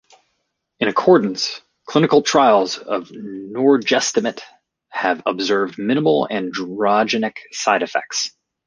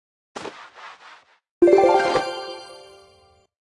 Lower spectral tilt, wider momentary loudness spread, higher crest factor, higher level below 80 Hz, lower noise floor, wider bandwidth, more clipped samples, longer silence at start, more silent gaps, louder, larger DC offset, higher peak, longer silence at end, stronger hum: about the same, -4 dB/octave vs -4.5 dB/octave; second, 12 LU vs 26 LU; about the same, 18 dB vs 20 dB; about the same, -64 dBFS vs -60 dBFS; first, -73 dBFS vs -57 dBFS; about the same, 10 kHz vs 11 kHz; neither; first, 0.8 s vs 0.35 s; second, none vs 1.51-1.61 s; about the same, -18 LUFS vs -18 LUFS; neither; first, 0 dBFS vs -4 dBFS; second, 0.4 s vs 0.95 s; neither